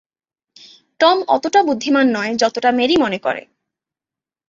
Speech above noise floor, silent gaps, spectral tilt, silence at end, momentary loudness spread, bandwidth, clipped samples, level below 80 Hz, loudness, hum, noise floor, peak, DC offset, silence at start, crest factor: 74 dB; none; -3.5 dB/octave; 1.1 s; 6 LU; 7.8 kHz; under 0.1%; -60 dBFS; -16 LUFS; none; -89 dBFS; -2 dBFS; under 0.1%; 1 s; 16 dB